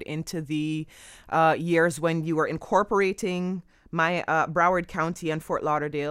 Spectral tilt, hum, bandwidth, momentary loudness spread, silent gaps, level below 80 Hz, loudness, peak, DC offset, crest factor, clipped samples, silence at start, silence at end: -6 dB/octave; none; 16 kHz; 10 LU; none; -56 dBFS; -25 LUFS; -8 dBFS; under 0.1%; 18 dB; under 0.1%; 0 s; 0 s